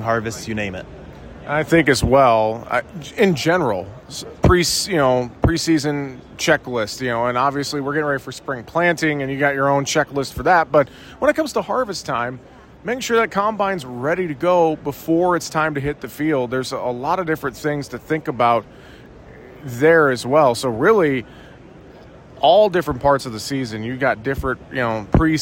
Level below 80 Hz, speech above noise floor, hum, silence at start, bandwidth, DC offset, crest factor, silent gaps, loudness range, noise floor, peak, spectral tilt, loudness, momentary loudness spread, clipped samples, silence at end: -38 dBFS; 23 dB; none; 0 s; 16.5 kHz; under 0.1%; 16 dB; none; 4 LU; -42 dBFS; -2 dBFS; -5 dB/octave; -19 LUFS; 12 LU; under 0.1%; 0 s